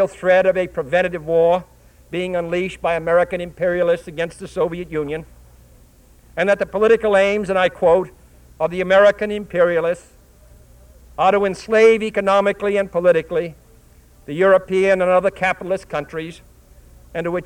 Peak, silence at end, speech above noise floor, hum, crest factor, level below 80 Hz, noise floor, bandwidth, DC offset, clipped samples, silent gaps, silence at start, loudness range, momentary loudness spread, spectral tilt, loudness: -2 dBFS; 0 s; 31 dB; none; 16 dB; -48 dBFS; -49 dBFS; 11.5 kHz; under 0.1%; under 0.1%; none; 0 s; 5 LU; 12 LU; -5.5 dB/octave; -18 LUFS